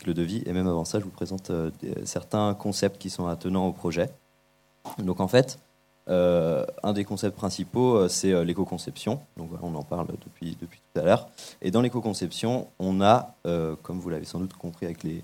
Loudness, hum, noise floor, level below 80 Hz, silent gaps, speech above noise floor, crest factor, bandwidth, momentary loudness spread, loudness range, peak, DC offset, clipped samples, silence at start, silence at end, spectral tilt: -27 LUFS; none; -64 dBFS; -56 dBFS; none; 38 dB; 22 dB; 16.5 kHz; 13 LU; 4 LU; -6 dBFS; under 0.1%; under 0.1%; 0 s; 0 s; -6 dB/octave